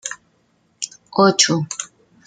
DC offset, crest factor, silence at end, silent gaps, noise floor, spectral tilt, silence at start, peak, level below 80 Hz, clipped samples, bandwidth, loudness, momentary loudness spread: under 0.1%; 20 dB; 0.4 s; none; -62 dBFS; -3 dB/octave; 0.05 s; 0 dBFS; -66 dBFS; under 0.1%; 11 kHz; -17 LUFS; 20 LU